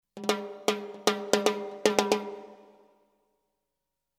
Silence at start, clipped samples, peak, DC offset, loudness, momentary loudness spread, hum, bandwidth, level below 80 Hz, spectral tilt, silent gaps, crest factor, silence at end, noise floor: 0.15 s; under 0.1%; -2 dBFS; under 0.1%; -29 LUFS; 5 LU; none; 17 kHz; -72 dBFS; -3 dB/octave; none; 28 dB; 1.65 s; -85 dBFS